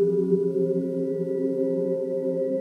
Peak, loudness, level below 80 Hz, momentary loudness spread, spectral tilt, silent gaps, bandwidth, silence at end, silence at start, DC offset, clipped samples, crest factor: -10 dBFS; -25 LUFS; -82 dBFS; 4 LU; -10.5 dB/octave; none; 2.1 kHz; 0 s; 0 s; under 0.1%; under 0.1%; 14 dB